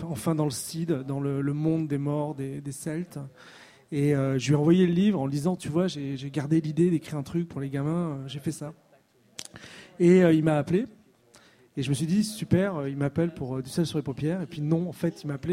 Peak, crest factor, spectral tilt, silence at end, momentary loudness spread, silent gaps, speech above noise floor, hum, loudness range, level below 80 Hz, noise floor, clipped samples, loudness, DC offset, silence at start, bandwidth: -8 dBFS; 18 dB; -7 dB/octave; 0 s; 14 LU; none; 35 dB; none; 5 LU; -60 dBFS; -61 dBFS; under 0.1%; -27 LUFS; under 0.1%; 0 s; 15.5 kHz